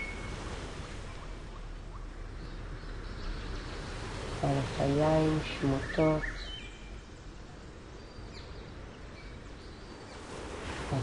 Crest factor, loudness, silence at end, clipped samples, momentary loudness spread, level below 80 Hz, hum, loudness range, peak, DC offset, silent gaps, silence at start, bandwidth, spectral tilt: 18 dB; -35 LUFS; 0 s; under 0.1%; 19 LU; -44 dBFS; none; 15 LU; -16 dBFS; under 0.1%; none; 0 s; 11 kHz; -6 dB/octave